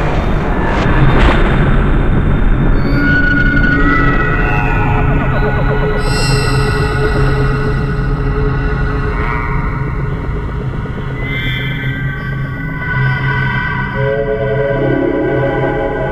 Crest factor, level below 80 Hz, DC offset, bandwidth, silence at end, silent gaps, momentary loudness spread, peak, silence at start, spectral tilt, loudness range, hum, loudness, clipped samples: 12 dB; -16 dBFS; under 0.1%; 12 kHz; 0 s; none; 8 LU; 0 dBFS; 0 s; -7 dB/octave; 6 LU; none; -14 LUFS; under 0.1%